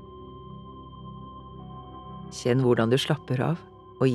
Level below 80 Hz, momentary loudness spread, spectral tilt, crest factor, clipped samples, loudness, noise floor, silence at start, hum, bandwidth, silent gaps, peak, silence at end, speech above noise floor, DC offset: -54 dBFS; 21 LU; -6.5 dB/octave; 20 dB; under 0.1%; -25 LUFS; -43 dBFS; 0 s; none; 13 kHz; none; -8 dBFS; 0 s; 19 dB; under 0.1%